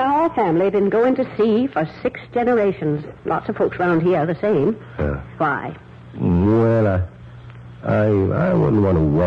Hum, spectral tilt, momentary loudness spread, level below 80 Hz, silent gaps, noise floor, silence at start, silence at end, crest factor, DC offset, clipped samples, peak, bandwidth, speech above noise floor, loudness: none; -10 dB/octave; 10 LU; -40 dBFS; none; -38 dBFS; 0 s; 0 s; 8 dB; under 0.1%; under 0.1%; -10 dBFS; 6.6 kHz; 20 dB; -19 LUFS